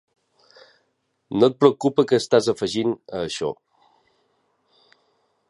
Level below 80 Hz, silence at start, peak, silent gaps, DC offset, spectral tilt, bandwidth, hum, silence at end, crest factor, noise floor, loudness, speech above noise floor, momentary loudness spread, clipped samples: -62 dBFS; 1.3 s; -2 dBFS; none; under 0.1%; -5.5 dB/octave; 11.5 kHz; none; 1.95 s; 22 dB; -71 dBFS; -21 LUFS; 51 dB; 12 LU; under 0.1%